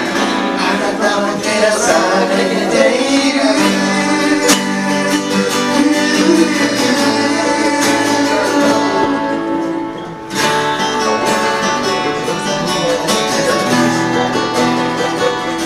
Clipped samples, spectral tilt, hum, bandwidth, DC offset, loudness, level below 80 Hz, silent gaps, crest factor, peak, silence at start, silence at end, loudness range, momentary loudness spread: under 0.1%; -3.5 dB/octave; none; 15.5 kHz; under 0.1%; -14 LUFS; -48 dBFS; none; 14 dB; 0 dBFS; 0 s; 0 s; 3 LU; 5 LU